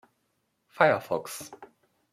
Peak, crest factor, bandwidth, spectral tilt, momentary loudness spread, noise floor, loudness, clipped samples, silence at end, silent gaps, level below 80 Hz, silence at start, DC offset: -6 dBFS; 24 dB; 15.5 kHz; -4.5 dB/octave; 17 LU; -76 dBFS; -26 LUFS; under 0.1%; 0.5 s; none; -76 dBFS; 0.8 s; under 0.1%